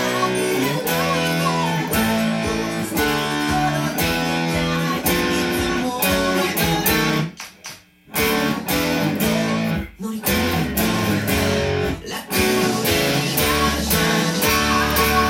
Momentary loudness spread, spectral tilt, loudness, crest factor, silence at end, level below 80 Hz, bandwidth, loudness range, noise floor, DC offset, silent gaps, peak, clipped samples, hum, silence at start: 6 LU; -4 dB/octave; -19 LUFS; 16 dB; 0 s; -38 dBFS; 17 kHz; 2 LU; -40 dBFS; under 0.1%; none; -4 dBFS; under 0.1%; none; 0 s